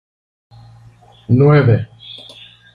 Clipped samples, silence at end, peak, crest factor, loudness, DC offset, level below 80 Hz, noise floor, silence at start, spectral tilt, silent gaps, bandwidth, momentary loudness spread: under 0.1%; 0.6 s; -2 dBFS; 16 dB; -13 LUFS; under 0.1%; -48 dBFS; -45 dBFS; 1.3 s; -10 dB/octave; none; 5 kHz; 23 LU